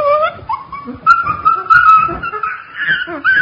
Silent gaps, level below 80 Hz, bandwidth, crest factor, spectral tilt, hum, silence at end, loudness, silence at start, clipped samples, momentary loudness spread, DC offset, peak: none; -44 dBFS; 7.4 kHz; 14 dB; -5 dB/octave; none; 0 s; -12 LUFS; 0 s; under 0.1%; 15 LU; under 0.1%; 0 dBFS